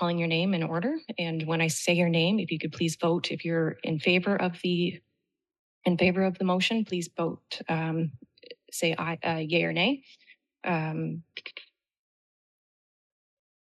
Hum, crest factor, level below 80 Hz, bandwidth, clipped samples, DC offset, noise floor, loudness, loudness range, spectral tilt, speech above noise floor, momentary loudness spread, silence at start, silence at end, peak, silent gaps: none; 18 dB; -74 dBFS; 12 kHz; under 0.1%; under 0.1%; -82 dBFS; -28 LUFS; 5 LU; -5 dB/octave; 55 dB; 11 LU; 0 s; 2.05 s; -10 dBFS; 5.59-5.81 s